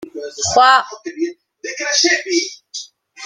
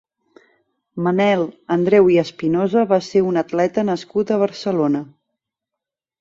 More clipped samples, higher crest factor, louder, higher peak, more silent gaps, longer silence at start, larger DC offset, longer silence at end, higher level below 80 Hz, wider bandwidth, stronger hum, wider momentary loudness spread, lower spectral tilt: neither; about the same, 18 dB vs 16 dB; first, -15 LUFS vs -18 LUFS; about the same, -2 dBFS vs -2 dBFS; neither; second, 0 s vs 0.95 s; neither; second, 0 s vs 1.15 s; about the same, -58 dBFS vs -60 dBFS; first, 11 kHz vs 7.6 kHz; neither; first, 19 LU vs 8 LU; second, -1 dB/octave vs -7 dB/octave